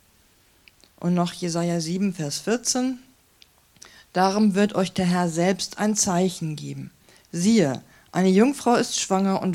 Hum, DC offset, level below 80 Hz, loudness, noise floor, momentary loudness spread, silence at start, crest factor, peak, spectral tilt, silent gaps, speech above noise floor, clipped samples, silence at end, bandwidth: none; under 0.1%; -62 dBFS; -23 LUFS; -59 dBFS; 11 LU; 1 s; 20 dB; -4 dBFS; -5 dB/octave; none; 37 dB; under 0.1%; 0 s; 15.5 kHz